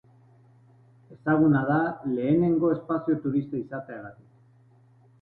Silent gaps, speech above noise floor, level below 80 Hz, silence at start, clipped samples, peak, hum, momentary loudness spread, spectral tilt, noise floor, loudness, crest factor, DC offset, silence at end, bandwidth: none; 33 dB; -62 dBFS; 1.1 s; under 0.1%; -12 dBFS; none; 16 LU; -12 dB/octave; -58 dBFS; -25 LUFS; 16 dB; under 0.1%; 1.1 s; 4.3 kHz